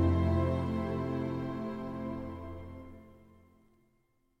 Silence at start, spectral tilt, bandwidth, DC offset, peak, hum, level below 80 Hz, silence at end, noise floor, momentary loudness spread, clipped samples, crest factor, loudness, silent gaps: 0 s; -9.5 dB/octave; 6 kHz; under 0.1%; -18 dBFS; none; -48 dBFS; 1.15 s; -73 dBFS; 19 LU; under 0.1%; 16 dB; -34 LUFS; none